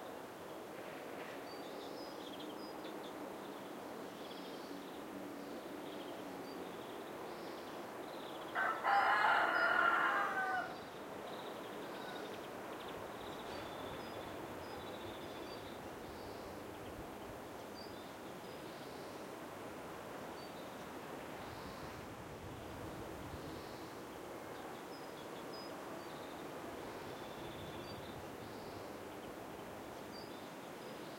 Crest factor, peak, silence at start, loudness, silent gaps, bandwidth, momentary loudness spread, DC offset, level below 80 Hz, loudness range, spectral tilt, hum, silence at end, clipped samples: 24 dB; -20 dBFS; 0 s; -43 LUFS; none; 16.5 kHz; 13 LU; under 0.1%; -70 dBFS; 14 LU; -4 dB/octave; none; 0 s; under 0.1%